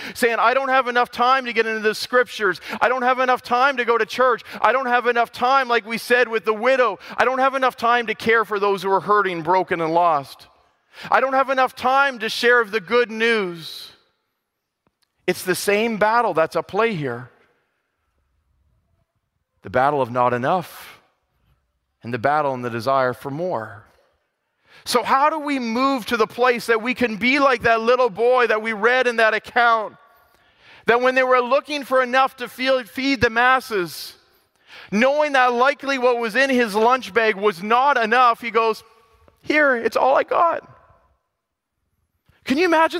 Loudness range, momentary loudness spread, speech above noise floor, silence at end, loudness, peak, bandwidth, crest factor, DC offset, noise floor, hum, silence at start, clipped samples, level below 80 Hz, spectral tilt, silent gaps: 6 LU; 8 LU; 59 dB; 0 s; -19 LUFS; -2 dBFS; 16 kHz; 18 dB; under 0.1%; -78 dBFS; none; 0 s; under 0.1%; -60 dBFS; -4 dB/octave; none